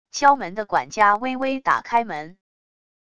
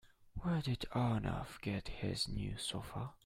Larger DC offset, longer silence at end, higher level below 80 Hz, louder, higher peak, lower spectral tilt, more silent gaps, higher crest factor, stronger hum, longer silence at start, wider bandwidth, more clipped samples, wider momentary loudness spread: neither; first, 0.8 s vs 0.1 s; second, -60 dBFS vs -52 dBFS; first, -21 LUFS vs -40 LUFS; first, -2 dBFS vs -22 dBFS; second, -3.5 dB/octave vs -5.5 dB/octave; neither; about the same, 20 dB vs 18 dB; neither; about the same, 0.15 s vs 0.05 s; second, 9.8 kHz vs 15.5 kHz; neither; first, 12 LU vs 8 LU